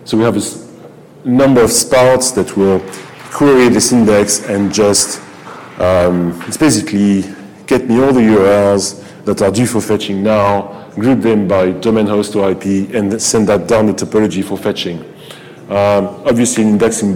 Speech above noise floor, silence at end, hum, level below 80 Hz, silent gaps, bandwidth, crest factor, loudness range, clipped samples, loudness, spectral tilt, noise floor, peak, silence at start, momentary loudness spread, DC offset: 25 dB; 0 s; none; -42 dBFS; none; 19 kHz; 10 dB; 3 LU; under 0.1%; -12 LUFS; -4.5 dB/octave; -36 dBFS; -2 dBFS; 0 s; 15 LU; under 0.1%